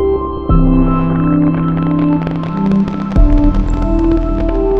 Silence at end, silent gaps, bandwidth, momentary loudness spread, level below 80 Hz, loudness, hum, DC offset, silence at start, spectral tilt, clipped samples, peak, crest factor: 0 s; none; 5.2 kHz; 5 LU; -16 dBFS; -14 LUFS; none; under 0.1%; 0 s; -10 dB/octave; under 0.1%; 0 dBFS; 12 dB